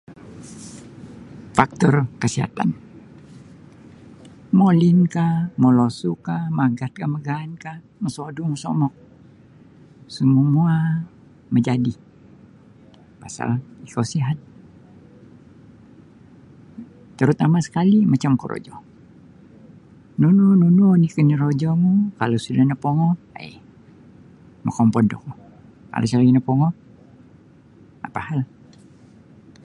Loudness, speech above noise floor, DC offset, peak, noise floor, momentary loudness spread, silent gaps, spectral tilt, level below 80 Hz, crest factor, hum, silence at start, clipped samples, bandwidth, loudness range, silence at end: -19 LUFS; 31 dB; under 0.1%; 0 dBFS; -49 dBFS; 22 LU; none; -7.5 dB/octave; -56 dBFS; 20 dB; none; 0.1 s; under 0.1%; 11 kHz; 11 LU; 1.2 s